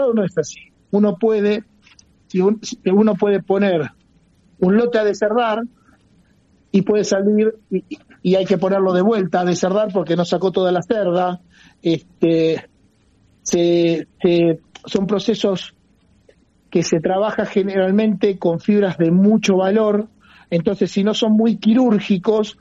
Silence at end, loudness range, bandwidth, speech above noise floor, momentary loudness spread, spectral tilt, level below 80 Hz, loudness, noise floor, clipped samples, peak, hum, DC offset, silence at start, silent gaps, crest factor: 0.1 s; 4 LU; 8 kHz; 39 dB; 9 LU; -6 dB/octave; -58 dBFS; -18 LUFS; -56 dBFS; under 0.1%; -4 dBFS; none; under 0.1%; 0 s; none; 14 dB